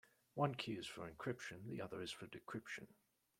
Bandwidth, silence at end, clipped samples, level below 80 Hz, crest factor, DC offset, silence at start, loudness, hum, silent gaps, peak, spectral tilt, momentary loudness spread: 16.5 kHz; 0.45 s; under 0.1%; -78 dBFS; 26 dB; under 0.1%; 0.35 s; -47 LUFS; none; none; -22 dBFS; -5 dB/octave; 11 LU